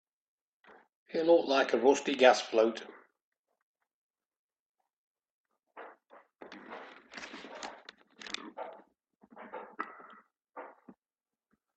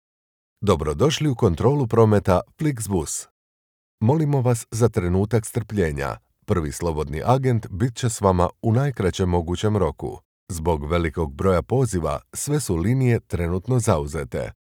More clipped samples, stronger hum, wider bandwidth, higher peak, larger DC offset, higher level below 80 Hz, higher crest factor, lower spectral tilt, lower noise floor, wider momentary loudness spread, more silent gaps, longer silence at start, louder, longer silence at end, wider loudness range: neither; neither; second, 8.8 kHz vs 17 kHz; second, -8 dBFS vs -2 dBFS; neither; second, -82 dBFS vs -38 dBFS; first, 26 dB vs 20 dB; second, -3 dB/octave vs -6.5 dB/octave; about the same, under -90 dBFS vs under -90 dBFS; first, 27 LU vs 8 LU; first, 3.24-3.32 s, 3.39-3.44 s, 3.62-3.75 s, 3.93-4.14 s, 4.37-4.49 s, 4.59-4.74 s, 4.93-5.15 s, 5.30-5.44 s vs 3.31-3.98 s, 10.25-10.47 s; first, 1.15 s vs 0.6 s; second, -29 LUFS vs -22 LUFS; first, 1.1 s vs 0.15 s; first, 22 LU vs 2 LU